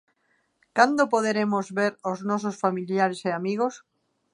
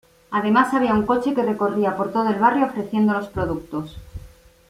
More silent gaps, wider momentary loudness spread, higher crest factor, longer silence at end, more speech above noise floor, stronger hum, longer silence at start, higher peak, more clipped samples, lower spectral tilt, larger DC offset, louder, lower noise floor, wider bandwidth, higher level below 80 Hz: neither; second, 8 LU vs 13 LU; first, 24 dB vs 18 dB; first, 0.55 s vs 0.4 s; first, 46 dB vs 26 dB; neither; first, 0.75 s vs 0.3 s; about the same, -2 dBFS vs -4 dBFS; neither; second, -5.5 dB/octave vs -7 dB/octave; neither; second, -25 LUFS vs -21 LUFS; first, -70 dBFS vs -46 dBFS; second, 11 kHz vs 14 kHz; second, -76 dBFS vs -46 dBFS